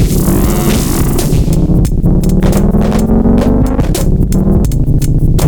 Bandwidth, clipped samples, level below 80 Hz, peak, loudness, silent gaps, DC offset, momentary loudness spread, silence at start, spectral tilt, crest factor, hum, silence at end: over 20 kHz; under 0.1%; -12 dBFS; 0 dBFS; -11 LUFS; none; under 0.1%; 3 LU; 0 s; -7 dB/octave; 8 dB; none; 0 s